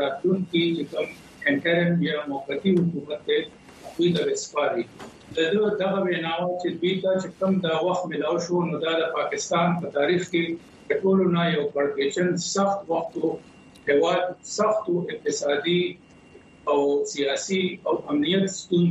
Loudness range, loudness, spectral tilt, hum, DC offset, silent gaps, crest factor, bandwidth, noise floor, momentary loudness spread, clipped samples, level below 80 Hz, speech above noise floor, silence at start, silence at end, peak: 2 LU; -24 LUFS; -5 dB/octave; none; under 0.1%; none; 16 dB; 8.6 kHz; -50 dBFS; 7 LU; under 0.1%; -66 dBFS; 26 dB; 0 s; 0 s; -8 dBFS